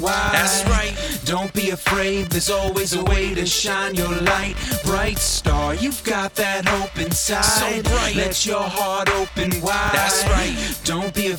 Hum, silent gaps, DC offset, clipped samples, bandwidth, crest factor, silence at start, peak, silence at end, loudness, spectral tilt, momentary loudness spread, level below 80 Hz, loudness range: none; none; under 0.1%; under 0.1%; over 20 kHz; 20 dB; 0 s; 0 dBFS; 0 s; -20 LUFS; -3 dB/octave; 6 LU; -28 dBFS; 1 LU